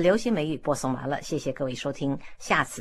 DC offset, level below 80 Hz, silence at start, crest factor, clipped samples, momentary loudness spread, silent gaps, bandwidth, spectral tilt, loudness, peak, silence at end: under 0.1%; -54 dBFS; 0 s; 20 dB; under 0.1%; 6 LU; none; 14 kHz; -5 dB/octave; -28 LUFS; -6 dBFS; 0 s